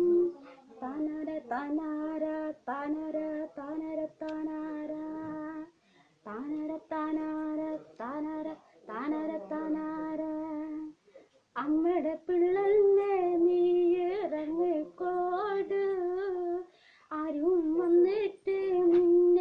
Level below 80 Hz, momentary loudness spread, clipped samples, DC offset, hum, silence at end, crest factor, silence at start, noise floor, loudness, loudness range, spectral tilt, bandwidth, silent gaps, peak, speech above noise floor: -70 dBFS; 15 LU; under 0.1%; under 0.1%; none; 0 s; 14 dB; 0 s; -65 dBFS; -31 LUFS; 10 LU; -7.5 dB/octave; 5 kHz; none; -16 dBFS; 33 dB